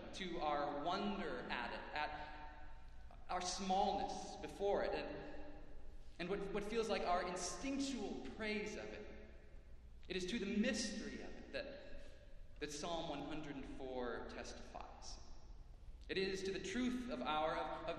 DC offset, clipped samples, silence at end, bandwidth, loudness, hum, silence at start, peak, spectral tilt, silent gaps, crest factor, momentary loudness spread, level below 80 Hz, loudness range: under 0.1%; under 0.1%; 0 s; 12.5 kHz; -44 LUFS; none; 0 s; -26 dBFS; -4 dB/octave; none; 18 dB; 22 LU; -58 dBFS; 5 LU